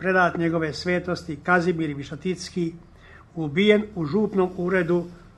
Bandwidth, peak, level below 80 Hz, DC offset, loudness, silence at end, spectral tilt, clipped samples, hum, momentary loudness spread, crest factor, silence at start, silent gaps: 11 kHz; -4 dBFS; -52 dBFS; under 0.1%; -24 LUFS; 0.1 s; -6.5 dB/octave; under 0.1%; none; 10 LU; 20 dB; 0 s; none